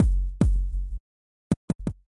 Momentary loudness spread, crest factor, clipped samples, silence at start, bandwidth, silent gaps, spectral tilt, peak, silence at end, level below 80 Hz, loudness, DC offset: 12 LU; 18 dB; under 0.1%; 0 s; 10.5 kHz; 1.00-1.50 s, 1.57-1.68 s, 1.75-1.79 s; -8.5 dB/octave; -8 dBFS; 0.25 s; -28 dBFS; -28 LUFS; under 0.1%